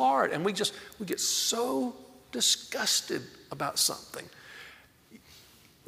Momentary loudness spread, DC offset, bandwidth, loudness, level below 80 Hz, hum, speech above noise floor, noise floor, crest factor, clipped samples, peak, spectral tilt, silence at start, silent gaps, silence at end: 20 LU; under 0.1%; 16 kHz; -28 LUFS; -72 dBFS; none; 26 dB; -57 dBFS; 20 dB; under 0.1%; -12 dBFS; -1.5 dB/octave; 0 s; none; 0.45 s